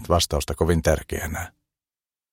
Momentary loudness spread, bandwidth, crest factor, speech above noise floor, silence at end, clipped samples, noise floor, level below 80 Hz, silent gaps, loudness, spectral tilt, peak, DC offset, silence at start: 11 LU; 16.5 kHz; 20 dB; over 67 dB; 0.85 s; under 0.1%; under -90 dBFS; -34 dBFS; none; -24 LUFS; -4.5 dB/octave; -4 dBFS; under 0.1%; 0 s